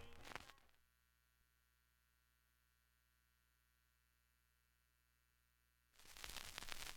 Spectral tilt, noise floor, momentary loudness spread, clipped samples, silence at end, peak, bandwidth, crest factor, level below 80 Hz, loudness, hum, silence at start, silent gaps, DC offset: -1 dB/octave; -82 dBFS; 13 LU; under 0.1%; 0 s; -26 dBFS; 17.5 kHz; 34 dB; -70 dBFS; -54 LUFS; 60 Hz at -85 dBFS; 0 s; none; under 0.1%